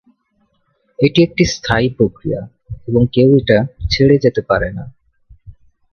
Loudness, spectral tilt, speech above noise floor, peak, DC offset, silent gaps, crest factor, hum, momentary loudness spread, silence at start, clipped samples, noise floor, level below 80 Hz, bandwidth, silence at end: -14 LUFS; -6.5 dB/octave; 49 dB; 0 dBFS; under 0.1%; none; 16 dB; none; 14 LU; 1 s; under 0.1%; -62 dBFS; -36 dBFS; 6.8 kHz; 0.4 s